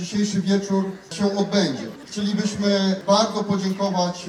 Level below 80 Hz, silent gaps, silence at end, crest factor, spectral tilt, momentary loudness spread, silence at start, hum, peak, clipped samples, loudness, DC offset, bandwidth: -60 dBFS; none; 0 s; 16 dB; -5 dB/octave; 7 LU; 0 s; none; -4 dBFS; under 0.1%; -22 LUFS; under 0.1%; 11 kHz